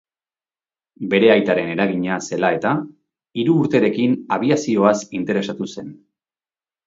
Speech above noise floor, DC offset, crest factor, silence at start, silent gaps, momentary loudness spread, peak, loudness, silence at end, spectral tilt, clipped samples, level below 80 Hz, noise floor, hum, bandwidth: over 72 dB; under 0.1%; 20 dB; 1 s; none; 14 LU; 0 dBFS; -19 LUFS; 0.9 s; -6 dB/octave; under 0.1%; -62 dBFS; under -90 dBFS; none; 7.8 kHz